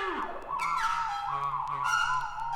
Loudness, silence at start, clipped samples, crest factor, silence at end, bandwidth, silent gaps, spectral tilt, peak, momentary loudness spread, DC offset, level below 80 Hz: -30 LUFS; 0 s; under 0.1%; 14 dB; 0 s; 18 kHz; none; -2.5 dB/octave; -16 dBFS; 6 LU; under 0.1%; -52 dBFS